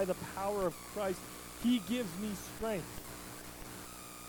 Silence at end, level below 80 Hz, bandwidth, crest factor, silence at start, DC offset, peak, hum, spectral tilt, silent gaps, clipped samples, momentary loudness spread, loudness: 0 s; -58 dBFS; 19 kHz; 18 dB; 0 s; under 0.1%; -22 dBFS; 60 Hz at -55 dBFS; -4.5 dB/octave; none; under 0.1%; 13 LU; -38 LUFS